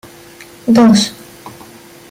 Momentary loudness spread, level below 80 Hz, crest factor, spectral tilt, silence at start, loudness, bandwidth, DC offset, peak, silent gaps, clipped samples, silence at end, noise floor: 26 LU; -52 dBFS; 12 dB; -5 dB/octave; 0.65 s; -11 LUFS; 16 kHz; under 0.1%; -2 dBFS; none; under 0.1%; 0.6 s; -38 dBFS